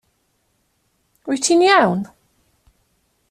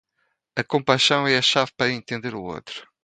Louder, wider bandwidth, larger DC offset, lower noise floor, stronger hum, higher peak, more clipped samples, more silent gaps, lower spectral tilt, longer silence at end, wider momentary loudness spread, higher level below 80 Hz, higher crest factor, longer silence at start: first, -16 LUFS vs -21 LUFS; first, 14 kHz vs 9.4 kHz; neither; second, -66 dBFS vs -73 dBFS; neither; about the same, -2 dBFS vs -2 dBFS; neither; neither; about the same, -3.5 dB/octave vs -3.5 dB/octave; first, 1.25 s vs 0.2 s; first, 21 LU vs 15 LU; about the same, -62 dBFS vs -62 dBFS; about the same, 18 dB vs 22 dB; first, 1.25 s vs 0.55 s